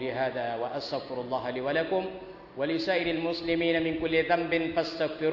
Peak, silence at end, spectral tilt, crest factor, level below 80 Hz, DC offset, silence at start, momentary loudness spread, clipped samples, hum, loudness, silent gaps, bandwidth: -12 dBFS; 0 s; -6.5 dB/octave; 18 dB; -58 dBFS; under 0.1%; 0 s; 8 LU; under 0.1%; none; -29 LUFS; none; 6 kHz